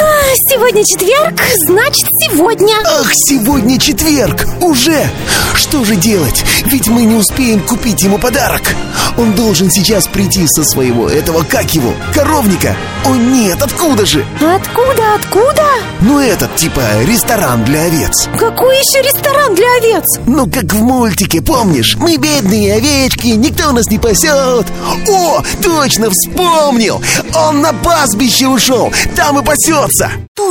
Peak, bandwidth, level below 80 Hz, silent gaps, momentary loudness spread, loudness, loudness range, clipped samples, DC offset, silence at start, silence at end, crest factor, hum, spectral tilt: 0 dBFS; 17.5 kHz; -26 dBFS; 30.28-30.35 s; 4 LU; -9 LUFS; 2 LU; under 0.1%; under 0.1%; 0 s; 0 s; 10 dB; none; -3.5 dB/octave